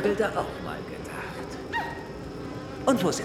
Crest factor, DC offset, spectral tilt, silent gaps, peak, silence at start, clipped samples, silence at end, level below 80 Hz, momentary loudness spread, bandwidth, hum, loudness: 20 dB; under 0.1%; -5 dB/octave; none; -8 dBFS; 0 s; under 0.1%; 0 s; -50 dBFS; 12 LU; 17 kHz; none; -31 LUFS